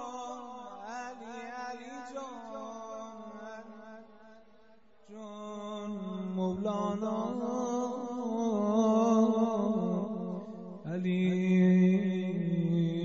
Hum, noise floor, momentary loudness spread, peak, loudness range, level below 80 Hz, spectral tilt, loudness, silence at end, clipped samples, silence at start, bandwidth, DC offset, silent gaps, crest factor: none; -63 dBFS; 19 LU; -14 dBFS; 16 LU; -74 dBFS; -8 dB/octave; -31 LUFS; 0 s; under 0.1%; 0 s; 7.6 kHz; 0.1%; none; 18 dB